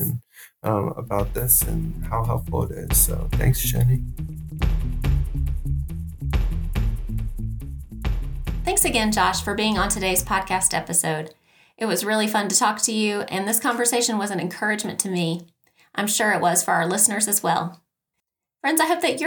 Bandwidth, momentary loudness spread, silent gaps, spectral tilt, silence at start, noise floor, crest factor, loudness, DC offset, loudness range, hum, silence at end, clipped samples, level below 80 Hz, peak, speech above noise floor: 19.5 kHz; 12 LU; none; -3.5 dB/octave; 0 s; -81 dBFS; 20 dB; -22 LUFS; under 0.1%; 6 LU; none; 0 s; under 0.1%; -30 dBFS; -2 dBFS; 60 dB